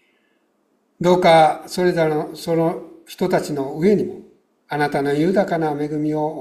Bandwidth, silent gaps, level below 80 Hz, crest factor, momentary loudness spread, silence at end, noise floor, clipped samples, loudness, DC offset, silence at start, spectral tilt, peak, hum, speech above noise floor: 15 kHz; none; -58 dBFS; 18 dB; 12 LU; 0 s; -65 dBFS; under 0.1%; -19 LUFS; under 0.1%; 1 s; -6.5 dB/octave; -2 dBFS; none; 47 dB